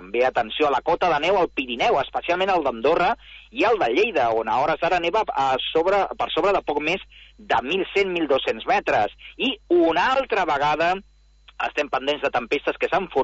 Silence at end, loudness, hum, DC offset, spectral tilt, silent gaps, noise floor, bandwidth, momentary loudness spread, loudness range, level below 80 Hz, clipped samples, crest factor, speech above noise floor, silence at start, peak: 0 s; -22 LUFS; none; under 0.1%; -4.5 dB/octave; none; -43 dBFS; 8 kHz; 5 LU; 2 LU; -50 dBFS; under 0.1%; 14 dB; 22 dB; 0 s; -8 dBFS